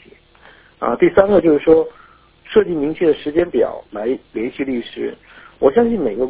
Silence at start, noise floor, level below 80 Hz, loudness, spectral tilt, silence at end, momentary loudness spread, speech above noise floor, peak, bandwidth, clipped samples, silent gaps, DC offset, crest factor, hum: 0.8 s; -47 dBFS; -46 dBFS; -17 LUFS; -10.5 dB/octave; 0 s; 12 LU; 31 dB; 0 dBFS; 4 kHz; under 0.1%; none; under 0.1%; 16 dB; none